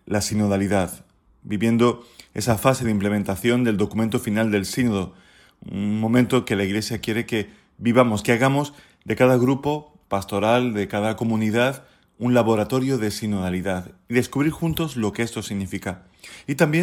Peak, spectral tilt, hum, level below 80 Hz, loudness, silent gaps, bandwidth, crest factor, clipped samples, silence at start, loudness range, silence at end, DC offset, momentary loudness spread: -2 dBFS; -6 dB/octave; none; -52 dBFS; -22 LUFS; none; 17.5 kHz; 20 dB; under 0.1%; 0.05 s; 3 LU; 0 s; under 0.1%; 12 LU